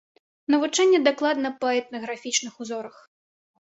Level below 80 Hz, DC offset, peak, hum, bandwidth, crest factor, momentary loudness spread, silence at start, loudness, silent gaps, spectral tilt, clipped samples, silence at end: -74 dBFS; under 0.1%; -4 dBFS; none; 8.4 kHz; 20 dB; 15 LU; 0.5 s; -23 LUFS; none; -1.5 dB/octave; under 0.1%; 0.9 s